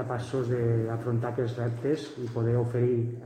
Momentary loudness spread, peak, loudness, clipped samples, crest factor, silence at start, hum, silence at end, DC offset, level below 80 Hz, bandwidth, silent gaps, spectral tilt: 4 LU; -14 dBFS; -29 LUFS; under 0.1%; 14 dB; 0 s; none; 0 s; under 0.1%; -60 dBFS; 9.4 kHz; none; -8.5 dB/octave